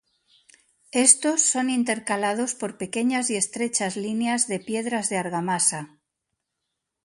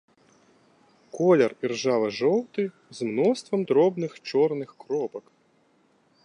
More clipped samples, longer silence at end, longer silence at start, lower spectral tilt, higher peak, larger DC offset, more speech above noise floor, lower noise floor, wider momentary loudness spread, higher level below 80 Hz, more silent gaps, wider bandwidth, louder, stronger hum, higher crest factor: neither; first, 1.2 s vs 1.05 s; second, 0.95 s vs 1.15 s; second, -2.5 dB/octave vs -6 dB/octave; first, 0 dBFS vs -8 dBFS; neither; first, 58 dB vs 40 dB; first, -81 dBFS vs -64 dBFS; about the same, 11 LU vs 12 LU; first, -72 dBFS vs -78 dBFS; neither; about the same, 11.5 kHz vs 10.5 kHz; about the same, -23 LUFS vs -25 LUFS; neither; first, 24 dB vs 18 dB